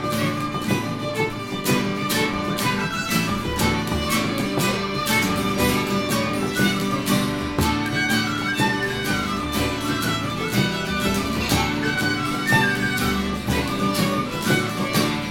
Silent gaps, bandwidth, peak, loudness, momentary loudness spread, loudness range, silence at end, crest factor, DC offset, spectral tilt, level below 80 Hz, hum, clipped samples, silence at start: none; 17 kHz; -4 dBFS; -22 LUFS; 4 LU; 1 LU; 0 s; 18 dB; under 0.1%; -4.5 dB/octave; -40 dBFS; none; under 0.1%; 0 s